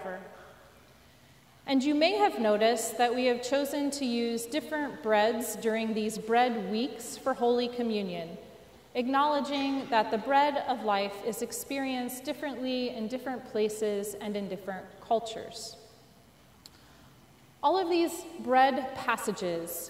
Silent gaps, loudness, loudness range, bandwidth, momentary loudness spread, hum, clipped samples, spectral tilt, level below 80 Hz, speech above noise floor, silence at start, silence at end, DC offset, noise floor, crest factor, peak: none; -30 LUFS; 6 LU; 16 kHz; 12 LU; none; under 0.1%; -3.5 dB/octave; -68 dBFS; 29 dB; 0 s; 0 s; under 0.1%; -58 dBFS; 20 dB; -12 dBFS